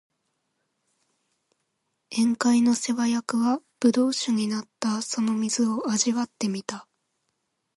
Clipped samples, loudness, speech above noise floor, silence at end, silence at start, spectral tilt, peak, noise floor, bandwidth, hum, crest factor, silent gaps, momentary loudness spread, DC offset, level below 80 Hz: under 0.1%; -25 LUFS; 53 dB; 0.95 s; 2.1 s; -3.5 dB/octave; -8 dBFS; -77 dBFS; 11.5 kHz; none; 18 dB; none; 8 LU; under 0.1%; -74 dBFS